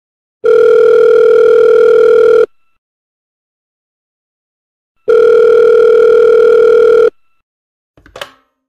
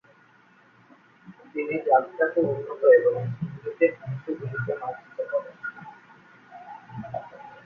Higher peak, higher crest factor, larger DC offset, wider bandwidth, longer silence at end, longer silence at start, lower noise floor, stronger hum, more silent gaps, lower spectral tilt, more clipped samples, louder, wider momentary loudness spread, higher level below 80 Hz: first, -2 dBFS vs -6 dBFS; second, 8 dB vs 20 dB; first, 0.2% vs under 0.1%; first, 6.4 kHz vs 3.8 kHz; first, 0.5 s vs 0.05 s; second, 0.45 s vs 1.25 s; second, -32 dBFS vs -57 dBFS; neither; first, 2.78-4.95 s, 7.43-7.94 s vs none; second, -4.5 dB/octave vs -10 dB/octave; neither; first, -7 LUFS vs -25 LUFS; second, 5 LU vs 23 LU; first, -52 dBFS vs -68 dBFS